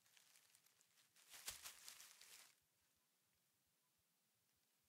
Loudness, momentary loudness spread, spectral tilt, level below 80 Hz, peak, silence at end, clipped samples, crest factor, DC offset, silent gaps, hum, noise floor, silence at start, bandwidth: -58 LUFS; 10 LU; 1.5 dB/octave; under -90 dBFS; -36 dBFS; 0 s; under 0.1%; 30 dB; under 0.1%; none; none; -86 dBFS; 0 s; 16 kHz